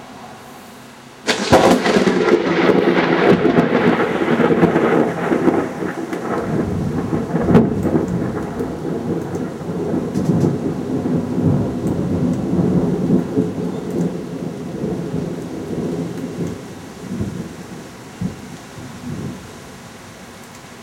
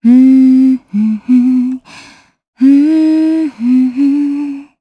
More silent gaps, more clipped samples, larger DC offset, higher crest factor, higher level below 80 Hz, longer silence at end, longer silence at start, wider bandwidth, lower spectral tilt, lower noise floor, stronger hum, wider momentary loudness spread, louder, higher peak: second, none vs 2.48-2.53 s; neither; neither; first, 18 dB vs 10 dB; first, -44 dBFS vs -60 dBFS; second, 0 s vs 0.2 s; about the same, 0 s vs 0.05 s; first, 16 kHz vs 5.4 kHz; second, -6.5 dB/octave vs -8 dB/octave; about the same, -39 dBFS vs -40 dBFS; neither; first, 21 LU vs 10 LU; second, -18 LUFS vs -10 LUFS; about the same, 0 dBFS vs 0 dBFS